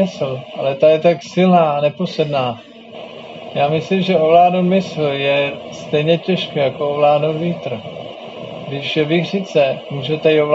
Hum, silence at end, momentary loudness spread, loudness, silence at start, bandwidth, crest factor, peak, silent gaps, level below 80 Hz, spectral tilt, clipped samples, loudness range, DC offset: none; 0 s; 18 LU; -16 LUFS; 0 s; 7.8 kHz; 16 dB; -2 dBFS; none; -62 dBFS; -4.5 dB/octave; under 0.1%; 3 LU; under 0.1%